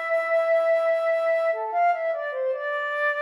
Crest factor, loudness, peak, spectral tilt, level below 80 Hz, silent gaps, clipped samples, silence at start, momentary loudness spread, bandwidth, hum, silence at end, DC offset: 10 dB; -24 LUFS; -14 dBFS; 1 dB/octave; under -90 dBFS; none; under 0.1%; 0 s; 6 LU; 11 kHz; none; 0 s; under 0.1%